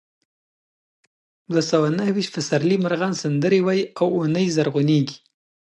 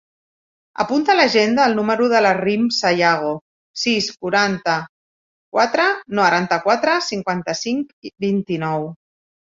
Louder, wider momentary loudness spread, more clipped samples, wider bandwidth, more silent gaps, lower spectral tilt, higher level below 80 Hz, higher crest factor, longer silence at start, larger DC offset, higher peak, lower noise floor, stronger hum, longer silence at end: second, -21 LUFS vs -18 LUFS; second, 4 LU vs 10 LU; neither; first, 11 kHz vs 7.8 kHz; second, none vs 3.41-3.74 s, 4.89-5.52 s, 7.93-8.02 s; first, -6 dB/octave vs -4 dB/octave; second, -68 dBFS vs -62 dBFS; about the same, 16 dB vs 18 dB; first, 1.5 s vs 0.8 s; neither; second, -6 dBFS vs 0 dBFS; about the same, under -90 dBFS vs under -90 dBFS; neither; about the same, 0.5 s vs 0.6 s